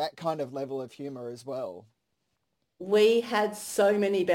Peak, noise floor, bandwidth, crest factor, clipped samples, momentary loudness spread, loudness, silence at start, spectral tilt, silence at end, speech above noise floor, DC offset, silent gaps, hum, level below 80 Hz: -10 dBFS; -79 dBFS; 16.5 kHz; 18 dB; under 0.1%; 16 LU; -27 LUFS; 0 s; -4.5 dB/octave; 0 s; 52 dB; under 0.1%; none; none; -76 dBFS